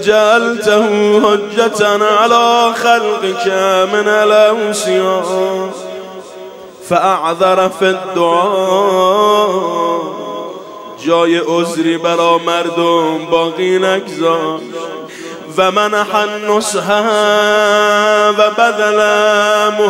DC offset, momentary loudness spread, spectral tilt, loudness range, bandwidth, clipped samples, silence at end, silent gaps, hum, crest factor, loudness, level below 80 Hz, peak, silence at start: under 0.1%; 14 LU; -3.5 dB/octave; 4 LU; 16.5 kHz; under 0.1%; 0 s; none; none; 12 dB; -12 LUFS; -60 dBFS; 0 dBFS; 0 s